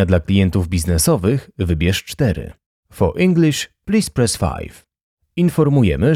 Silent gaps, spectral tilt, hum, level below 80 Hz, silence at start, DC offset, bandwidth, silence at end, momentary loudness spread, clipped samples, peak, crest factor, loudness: 2.66-2.83 s, 5.03-5.17 s; -6 dB/octave; none; -32 dBFS; 0 s; under 0.1%; 16 kHz; 0 s; 9 LU; under 0.1%; -4 dBFS; 14 dB; -17 LUFS